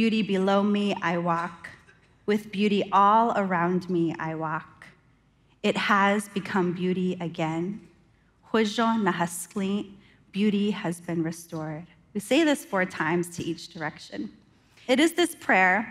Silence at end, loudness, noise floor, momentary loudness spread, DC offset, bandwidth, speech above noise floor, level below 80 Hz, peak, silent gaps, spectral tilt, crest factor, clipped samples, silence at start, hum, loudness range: 0 s; -26 LUFS; -62 dBFS; 15 LU; under 0.1%; 16 kHz; 37 dB; -66 dBFS; -8 dBFS; none; -5 dB/octave; 18 dB; under 0.1%; 0 s; none; 4 LU